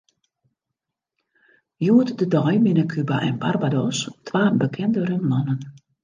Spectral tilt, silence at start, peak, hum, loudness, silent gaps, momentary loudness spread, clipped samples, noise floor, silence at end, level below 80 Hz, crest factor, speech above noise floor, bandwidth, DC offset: -6.5 dB/octave; 1.8 s; -4 dBFS; none; -21 LUFS; none; 8 LU; under 0.1%; -83 dBFS; 0.3 s; -66 dBFS; 18 dB; 63 dB; 9.8 kHz; under 0.1%